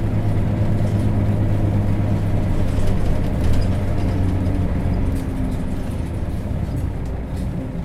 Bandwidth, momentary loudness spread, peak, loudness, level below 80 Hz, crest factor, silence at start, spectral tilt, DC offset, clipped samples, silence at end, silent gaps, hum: 13 kHz; 6 LU; -6 dBFS; -22 LUFS; -24 dBFS; 12 dB; 0 s; -8.5 dB/octave; under 0.1%; under 0.1%; 0 s; none; none